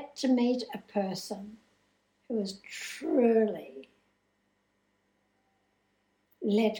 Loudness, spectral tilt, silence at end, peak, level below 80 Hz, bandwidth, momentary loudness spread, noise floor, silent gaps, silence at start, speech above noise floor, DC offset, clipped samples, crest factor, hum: -30 LUFS; -5.5 dB/octave; 0 s; -14 dBFS; -78 dBFS; 18.5 kHz; 17 LU; -75 dBFS; none; 0 s; 45 dB; under 0.1%; under 0.1%; 18 dB; 50 Hz at -65 dBFS